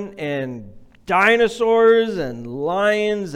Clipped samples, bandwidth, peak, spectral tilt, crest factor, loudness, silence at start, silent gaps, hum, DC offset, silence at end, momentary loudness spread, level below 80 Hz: under 0.1%; 12 kHz; -4 dBFS; -5 dB/octave; 14 dB; -18 LUFS; 0 s; none; none; under 0.1%; 0 s; 13 LU; -50 dBFS